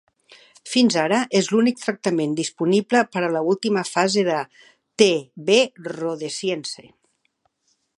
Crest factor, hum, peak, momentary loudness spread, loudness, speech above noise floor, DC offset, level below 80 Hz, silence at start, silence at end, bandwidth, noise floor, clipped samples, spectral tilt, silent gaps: 20 dB; none; 0 dBFS; 10 LU; -21 LUFS; 49 dB; under 0.1%; -70 dBFS; 0.65 s; 1.15 s; 11.5 kHz; -69 dBFS; under 0.1%; -4 dB/octave; none